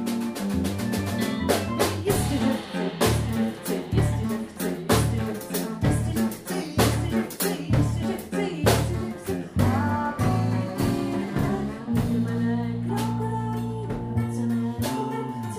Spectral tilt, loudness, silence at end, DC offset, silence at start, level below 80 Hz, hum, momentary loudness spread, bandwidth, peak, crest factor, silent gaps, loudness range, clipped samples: -6 dB/octave; -26 LUFS; 0 s; under 0.1%; 0 s; -40 dBFS; none; 6 LU; 16 kHz; -6 dBFS; 20 dB; none; 2 LU; under 0.1%